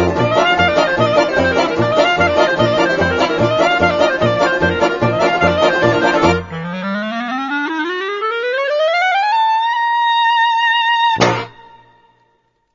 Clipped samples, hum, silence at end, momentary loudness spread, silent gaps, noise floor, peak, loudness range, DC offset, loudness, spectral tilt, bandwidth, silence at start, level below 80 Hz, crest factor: under 0.1%; none; 1.15 s; 7 LU; none; -61 dBFS; 0 dBFS; 3 LU; under 0.1%; -14 LUFS; -5 dB/octave; 7.6 kHz; 0 s; -42 dBFS; 14 dB